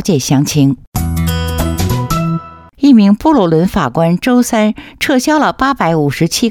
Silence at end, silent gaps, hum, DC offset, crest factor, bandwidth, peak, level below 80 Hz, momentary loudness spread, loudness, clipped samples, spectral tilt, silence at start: 0 s; 0.87-0.92 s; none; under 0.1%; 12 dB; 18 kHz; 0 dBFS; -28 dBFS; 7 LU; -12 LUFS; under 0.1%; -5.5 dB/octave; 0 s